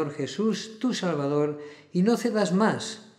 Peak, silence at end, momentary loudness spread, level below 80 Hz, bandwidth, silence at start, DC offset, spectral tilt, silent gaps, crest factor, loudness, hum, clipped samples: -10 dBFS; 0.15 s; 8 LU; -78 dBFS; 14.5 kHz; 0 s; under 0.1%; -5.5 dB/octave; none; 16 dB; -26 LUFS; none; under 0.1%